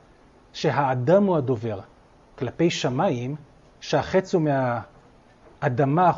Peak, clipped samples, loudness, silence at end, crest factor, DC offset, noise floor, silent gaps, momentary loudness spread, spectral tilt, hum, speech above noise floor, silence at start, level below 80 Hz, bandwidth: -6 dBFS; under 0.1%; -24 LUFS; 0 s; 18 dB; under 0.1%; -54 dBFS; none; 14 LU; -6.5 dB/octave; none; 32 dB; 0.55 s; -56 dBFS; 7.8 kHz